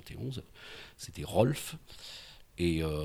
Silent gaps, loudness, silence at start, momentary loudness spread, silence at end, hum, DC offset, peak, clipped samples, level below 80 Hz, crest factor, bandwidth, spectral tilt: none; -33 LUFS; 0 s; 19 LU; 0 s; none; under 0.1%; -12 dBFS; under 0.1%; -50 dBFS; 22 dB; 20 kHz; -6 dB/octave